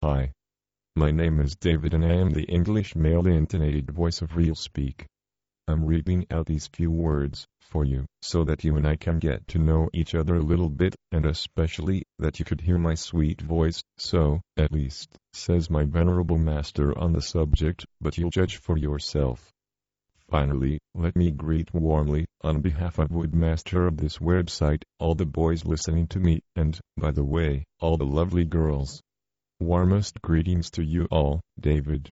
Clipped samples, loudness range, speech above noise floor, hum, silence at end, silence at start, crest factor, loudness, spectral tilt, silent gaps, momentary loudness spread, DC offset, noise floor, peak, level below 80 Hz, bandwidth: under 0.1%; 3 LU; over 66 dB; none; 0.05 s; 0 s; 16 dB; -26 LUFS; -7.5 dB/octave; none; 6 LU; under 0.1%; under -90 dBFS; -8 dBFS; -32 dBFS; 8 kHz